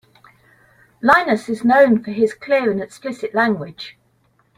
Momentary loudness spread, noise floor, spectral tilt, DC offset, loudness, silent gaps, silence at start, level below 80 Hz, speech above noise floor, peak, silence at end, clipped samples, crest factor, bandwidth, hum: 15 LU; -61 dBFS; -6 dB/octave; under 0.1%; -17 LUFS; none; 1.05 s; -60 dBFS; 43 dB; 0 dBFS; 0.65 s; under 0.1%; 18 dB; 14.5 kHz; none